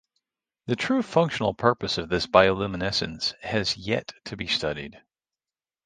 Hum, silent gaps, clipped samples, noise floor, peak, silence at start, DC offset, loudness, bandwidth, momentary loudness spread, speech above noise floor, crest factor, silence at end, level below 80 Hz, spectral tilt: none; none; under 0.1%; under -90 dBFS; -2 dBFS; 0.65 s; under 0.1%; -25 LUFS; 9.6 kHz; 13 LU; over 65 dB; 24 dB; 0.9 s; -52 dBFS; -5 dB/octave